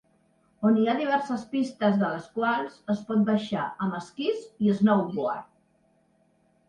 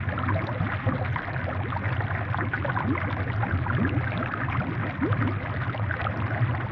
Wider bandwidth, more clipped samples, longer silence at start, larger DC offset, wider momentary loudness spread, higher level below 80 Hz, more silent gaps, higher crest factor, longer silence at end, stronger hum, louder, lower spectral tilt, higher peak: first, 9.4 kHz vs 5.2 kHz; neither; first, 0.6 s vs 0 s; neither; first, 8 LU vs 3 LU; second, -70 dBFS vs -46 dBFS; neither; about the same, 18 dB vs 14 dB; first, 1.25 s vs 0 s; neither; about the same, -27 LUFS vs -28 LUFS; about the same, -7.5 dB/octave vs -6.5 dB/octave; first, -8 dBFS vs -14 dBFS